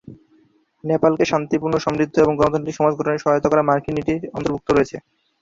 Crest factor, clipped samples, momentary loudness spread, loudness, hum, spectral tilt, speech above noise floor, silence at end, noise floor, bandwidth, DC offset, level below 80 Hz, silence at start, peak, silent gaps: 18 dB; under 0.1%; 8 LU; -19 LUFS; none; -6.5 dB/octave; 39 dB; 0.45 s; -58 dBFS; 7.6 kHz; under 0.1%; -48 dBFS; 0.05 s; -2 dBFS; none